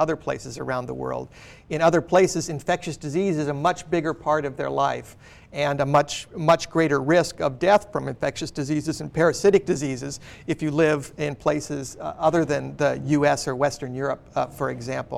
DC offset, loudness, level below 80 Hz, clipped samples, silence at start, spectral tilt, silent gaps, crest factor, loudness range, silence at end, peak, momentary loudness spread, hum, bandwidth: under 0.1%; -24 LUFS; -52 dBFS; under 0.1%; 0 s; -5.5 dB/octave; none; 16 dB; 3 LU; 0 s; -8 dBFS; 11 LU; none; 15 kHz